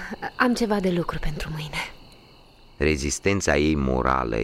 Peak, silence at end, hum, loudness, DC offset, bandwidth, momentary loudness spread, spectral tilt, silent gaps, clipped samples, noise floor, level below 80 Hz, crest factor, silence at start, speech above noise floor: -6 dBFS; 0 s; none; -24 LUFS; under 0.1%; 16 kHz; 10 LU; -5 dB/octave; none; under 0.1%; -51 dBFS; -36 dBFS; 20 dB; 0 s; 27 dB